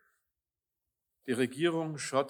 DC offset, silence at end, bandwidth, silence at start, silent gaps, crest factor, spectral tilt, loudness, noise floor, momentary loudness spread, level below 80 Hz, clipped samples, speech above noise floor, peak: under 0.1%; 0 s; 19 kHz; 1.25 s; none; 20 dB; -5 dB/octave; -32 LUFS; under -90 dBFS; 8 LU; -88 dBFS; under 0.1%; over 59 dB; -16 dBFS